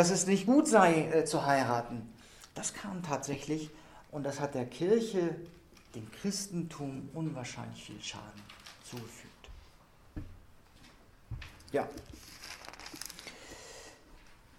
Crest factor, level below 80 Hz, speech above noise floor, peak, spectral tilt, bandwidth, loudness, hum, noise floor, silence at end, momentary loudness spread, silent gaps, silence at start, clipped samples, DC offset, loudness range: 26 dB; -58 dBFS; 28 dB; -10 dBFS; -4.5 dB/octave; 16 kHz; -32 LUFS; none; -59 dBFS; 0.25 s; 24 LU; none; 0 s; under 0.1%; under 0.1%; 17 LU